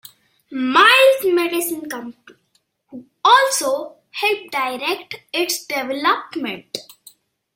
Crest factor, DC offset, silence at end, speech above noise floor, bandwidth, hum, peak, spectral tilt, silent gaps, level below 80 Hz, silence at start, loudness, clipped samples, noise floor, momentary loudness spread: 20 dB; under 0.1%; 0.75 s; 46 dB; 16.5 kHz; none; 0 dBFS; -1 dB/octave; none; -72 dBFS; 0.5 s; -17 LUFS; under 0.1%; -66 dBFS; 19 LU